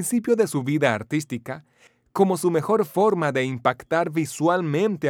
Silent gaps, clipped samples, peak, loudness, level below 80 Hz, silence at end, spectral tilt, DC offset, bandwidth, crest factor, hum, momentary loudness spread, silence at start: none; under 0.1%; -4 dBFS; -23 LUFS; -68 dBFS; 0 s; -5.5 dB/octave; under 0.1%; 18.5 kHz; 18 dB; none; 10 LU; 0 s